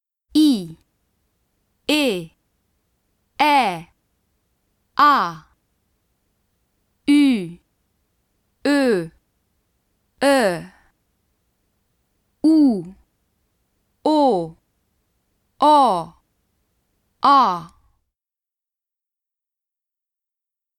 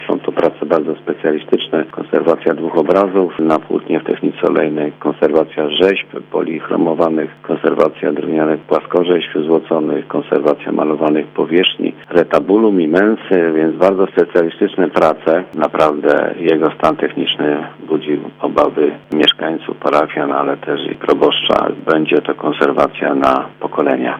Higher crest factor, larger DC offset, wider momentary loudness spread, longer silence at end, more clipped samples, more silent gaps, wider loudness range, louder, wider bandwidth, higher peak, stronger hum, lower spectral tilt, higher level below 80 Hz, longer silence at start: first, 20 dB vs 14 dB; neither; first, 19 LU vs 7 LU; first, 3.1 s vs 0 s; second, under 0.1% vs 0.1%; neither; about the same, 4 LU vs 2 LU; second, -18 LUFS vs -15 LUFS; first, 14.5 kHz vs 8.6 kHz; about the same, -2 dBFS vs 0 dBFS; neither; second, -4.5 dB/octave vs -6.5 dB/octave; second, -62 dBFS vs -54 dBFS; first, 0.35 s vs 0 s